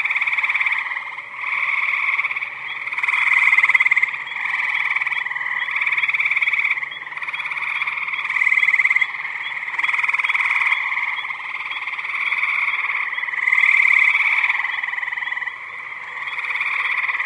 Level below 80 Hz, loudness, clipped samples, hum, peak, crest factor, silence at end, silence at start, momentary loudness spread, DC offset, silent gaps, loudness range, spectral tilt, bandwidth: -80 dBFS; -18 LUFS; under 0.1%; none; -2 dBFS; 18 dB; 0 s; 0 s; 12 LU; under 0.1%; none; 3 LU; 0.5 dB/octave; 11 kHz